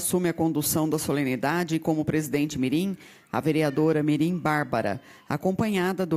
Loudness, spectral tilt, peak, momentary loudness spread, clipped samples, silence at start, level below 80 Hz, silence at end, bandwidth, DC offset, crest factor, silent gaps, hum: -26 LUFS; -5.5 dB/octave; -10 dBFS; 6 LU; under 0.1%; 0 s; -58 dBFS; 0 s; 16 kHz; under 0.1%; 16 dB; none; none